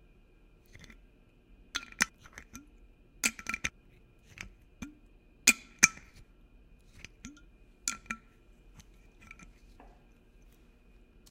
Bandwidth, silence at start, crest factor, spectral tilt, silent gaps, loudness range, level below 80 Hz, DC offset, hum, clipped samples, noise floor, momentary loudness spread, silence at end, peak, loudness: 16.5 kHz; 1.75 s; 38 dB; 0 dB/octave; none; 14 LU; -58 dBFS; under 0.1%; none; under 0.1%; -61 dBFS; 28 LU; 3.15 s; -2 dBFS; -30 LUFS